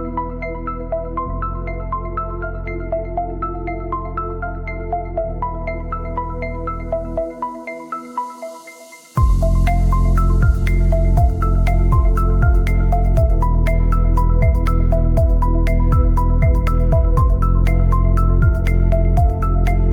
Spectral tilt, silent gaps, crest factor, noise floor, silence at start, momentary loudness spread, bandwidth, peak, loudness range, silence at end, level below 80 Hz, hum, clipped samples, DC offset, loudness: -8.5 dB/octave; none; 12 dB; -40 dBFS; 0 s; 10 LU; 3.8 kHz; -4 dBFS; 8 LU; 0 s; -18 dBFS; none; under 0.1%; under 0.1%; -19 LUFS